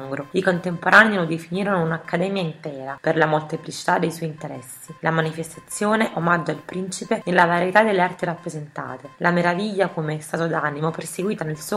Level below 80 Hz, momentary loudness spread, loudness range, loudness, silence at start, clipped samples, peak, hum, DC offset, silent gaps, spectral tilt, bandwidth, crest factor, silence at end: -64 dBFS; 15 LU; 4 LU; -21 LUFS; 0 s; under 0.1%; 0 dBFS; none; under 0.1%; none; -5.5 dB/octave; 14.5 kHz; 22 dB; 0 s